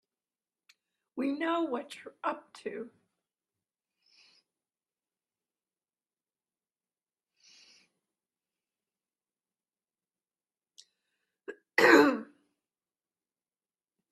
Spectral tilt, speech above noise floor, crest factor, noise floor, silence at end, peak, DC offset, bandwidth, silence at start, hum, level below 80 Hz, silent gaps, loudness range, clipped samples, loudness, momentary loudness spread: -3.5 dB/octave; over 62 dB; 30 dB; under -90 dBFS; 1.85 s; -6 dBFS; under 0.1%; 12.5 kHz; 1.15 s; none; -84 dBFS; none; 15 LU; under 0.1%; -28 LUFS; 27 LU